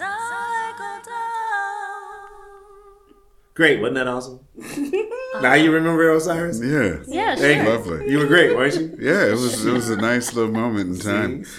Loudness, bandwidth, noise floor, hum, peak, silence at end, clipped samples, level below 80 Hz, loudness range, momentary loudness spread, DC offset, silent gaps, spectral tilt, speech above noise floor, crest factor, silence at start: -19 LUFS; 16 kHz; -53 dBFS; none; 0 dBFS; 0 s; under 0.1%; -52 dBFS; 6 LU; 16 LU; under 0.1%; none; -4.5 dB/octave; 34 dB; 20 dB; 0 s